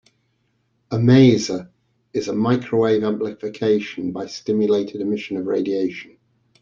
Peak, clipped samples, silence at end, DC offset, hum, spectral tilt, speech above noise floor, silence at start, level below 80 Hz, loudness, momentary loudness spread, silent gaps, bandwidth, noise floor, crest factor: -2 dBFS; under 0.1%; 0.55 s; under 0.1%; none; -7 dB/octave; 48 dB; 0.9 s; -56 dBFS; -20 LUFS; 13 LU; none; 7.6 kHz; -67 dBFS; 18 dB